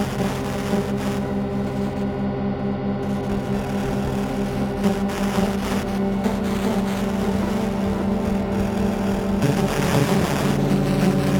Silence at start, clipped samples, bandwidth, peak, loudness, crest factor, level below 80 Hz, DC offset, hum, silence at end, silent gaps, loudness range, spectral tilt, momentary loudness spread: 0 s; under 0.1%; 19 kHz; -6 dBFS; -22 LUFS; 16 dB; -36 dBFS; under 0.1%; none; 0 s; none; 3 LU; -6.5 dB/octave; 5 LU